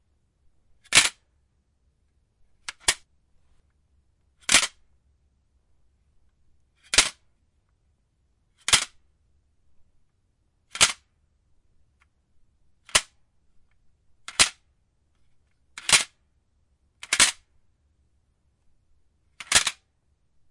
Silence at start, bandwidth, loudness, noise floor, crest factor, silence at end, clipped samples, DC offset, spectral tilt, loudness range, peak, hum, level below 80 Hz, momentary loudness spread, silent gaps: 0.9 s; 11.5 kHz; -21 LUFS; -69 dBFS; 28 dB; 0.8 s; under 0.1%; under 0.1%; 1 dB/octave; 4 LU; -2 dBFS; none; -56 dBFS; 15 LU; none